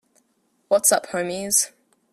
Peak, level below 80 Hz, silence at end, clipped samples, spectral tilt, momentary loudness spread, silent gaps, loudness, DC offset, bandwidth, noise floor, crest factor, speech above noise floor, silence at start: -4 dBFS; -68 dBFS; 0.45 s; under 0.1%; -1.5 dB/octave; 9 LU; none; -20 LUFS; under 0.1%; 15.5 kHz; -67 dBFS; 20 dB; 46 dB; 0.7 s